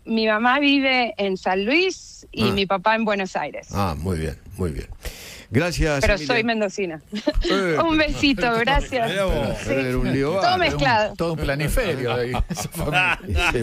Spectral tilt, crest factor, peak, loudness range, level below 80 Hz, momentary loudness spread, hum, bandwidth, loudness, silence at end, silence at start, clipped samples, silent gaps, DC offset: -5 dB/octave; 16 dB; -4 dBFS; 4 LU; -32 dBFS; 10 LU; none; 16 kHz; -21 LUFS; 0 s; 0.05 s; under 0.1%; none; under 0.1%